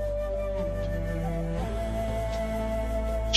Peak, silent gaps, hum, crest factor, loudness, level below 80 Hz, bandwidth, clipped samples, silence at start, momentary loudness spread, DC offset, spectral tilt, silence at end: -6 dBFS; none; none; 22 dB; -31 LUFS; -32 dBFS; 13 kHz; under 0.1%; 0 s; 1 LU; under 0.1%; -6 dB/octave; 0 s